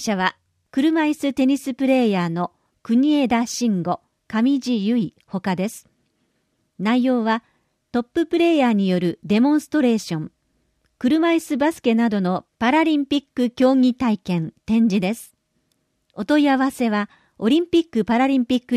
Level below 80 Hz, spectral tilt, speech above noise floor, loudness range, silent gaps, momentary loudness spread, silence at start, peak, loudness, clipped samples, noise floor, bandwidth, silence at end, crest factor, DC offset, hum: -58 dBFS; -6 dB/octave; 50 dB; 4 LU; none; 9 LU; 0 s; -4 dBFS; -20 LUFS; under 0.1%; -69 dBFS; 14.5 kHz; 0 s; 16 dB; under 0.1%; none